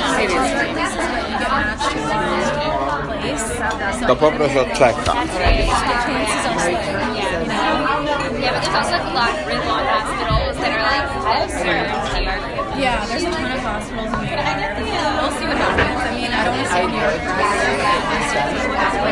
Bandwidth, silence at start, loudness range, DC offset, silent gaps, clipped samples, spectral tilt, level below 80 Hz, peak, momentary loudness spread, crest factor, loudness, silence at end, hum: 11.5 kHz; 0 s; 3 LU; under 0.1%; none; under 0.1%; -4 dB/octave; -32 dBFS; 0 dBFS; 5 LU; 18 dB; -19 LUFS; 0 s; none